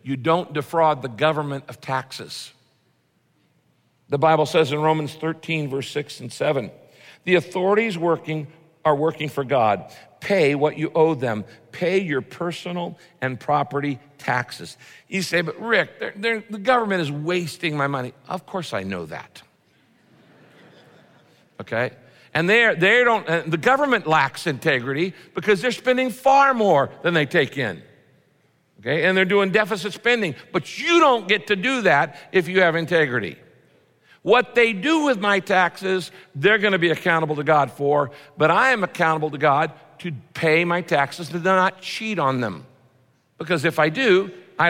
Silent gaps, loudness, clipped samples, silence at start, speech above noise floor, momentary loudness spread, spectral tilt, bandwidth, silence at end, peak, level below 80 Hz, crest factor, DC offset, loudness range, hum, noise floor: none; -21 LUFS; under 0.1%; 0.05 s; 44 dB; 13 LU; -5.5 dB/octave; 16.5 kHz; 0 s; -4 dBFS; -68 dBFS; 18 dB; under 0.1%; 7 LU; none; -65 dBFS